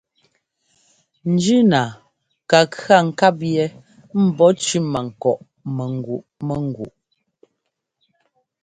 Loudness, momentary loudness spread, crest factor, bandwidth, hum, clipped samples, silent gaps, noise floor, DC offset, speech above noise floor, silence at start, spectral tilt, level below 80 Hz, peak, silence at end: -19 LUFS; 13 LU; 20 dB; 9.4 kHz; none; under 0.1%; none; -76 dBFS; under 0.1%; 59 dB; 1.25 s; -5.5 dB/octave; -58 dBFS; 0 dBFS; 1.75 s